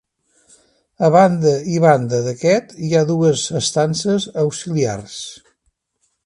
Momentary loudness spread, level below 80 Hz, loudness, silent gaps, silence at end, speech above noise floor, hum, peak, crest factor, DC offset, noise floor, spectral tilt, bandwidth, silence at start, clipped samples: 9 LU; -56 dBFS; -17 LUFS; none; 0.9 s; 52 dB; none; 0 dBFS; 18 dB; under 0.1%; -68 dBFS; -5.5 dB/octave; 11.5 kHz; 1 s; under 0.1%